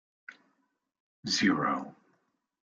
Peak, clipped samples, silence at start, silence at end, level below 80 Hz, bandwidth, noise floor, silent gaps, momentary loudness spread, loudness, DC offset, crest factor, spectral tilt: -14 dBFS; under 0.1%; 0.3 s; 0.8 s; -74 dBFS; 9 kHz; -77 dBFS; 1.00-1.23 s; 17 LU; -29 LUFS; under 0.1%; 20 dB; -3.5 dB/octave